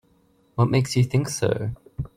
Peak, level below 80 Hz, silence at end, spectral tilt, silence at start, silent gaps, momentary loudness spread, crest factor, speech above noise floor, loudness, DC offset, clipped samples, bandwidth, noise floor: -6 dBFS; -48 dBFS; 0.1 s; -6 dB/octave; 0.55 s; none; 13 LU; 18 dB; 40 dB; -23 LUFS; under 0.1%; under 0.1%; 15 kHz; -61 dBFS